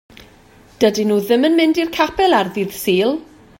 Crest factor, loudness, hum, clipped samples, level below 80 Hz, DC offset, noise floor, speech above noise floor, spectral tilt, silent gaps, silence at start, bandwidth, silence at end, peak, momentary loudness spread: 16 dB; -16 LUFS; none; under 0.1%; -50 dBFS; under 0.1%; -47 dBFS; 31 dB; -4.5 dB/octave; none; 0.8 s; 16.5 kHz; 0.35 s; 0 dBFS; 7 LU